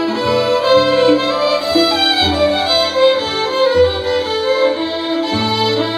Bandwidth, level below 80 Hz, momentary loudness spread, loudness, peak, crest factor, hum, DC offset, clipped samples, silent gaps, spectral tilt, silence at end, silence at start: 14 kHz; -40 dBFS; 6 LU; -14 LUFS; 0 dBFS; 14 dB; none; under 0.1%; under 0.1%; none; -4.5 dB/octave; 0 s; 0 s